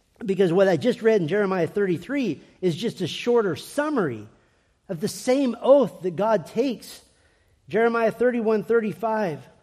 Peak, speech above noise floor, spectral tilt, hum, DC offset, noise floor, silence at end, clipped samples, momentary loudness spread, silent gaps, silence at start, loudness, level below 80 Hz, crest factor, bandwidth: -6 dBFS; 41 dB; -6 dB/octave; none; under 0.1%; -63 dBFS; 0.2 s; under 0.1%; 10 LU; none; 0.2 s; -23 LUFS; -66 dBFS; 18 dB; 15 kHz